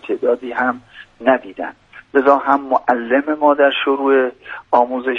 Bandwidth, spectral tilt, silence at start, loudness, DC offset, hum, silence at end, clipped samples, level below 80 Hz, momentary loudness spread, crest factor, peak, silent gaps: 6.4 kHz; -6 dB/octave; 0.05 s; -16 LUFS; under 0.1%; none; 0 s; under 0.1%; -60 dBFS; 12 LU; 16 dB; 0 dBFS; none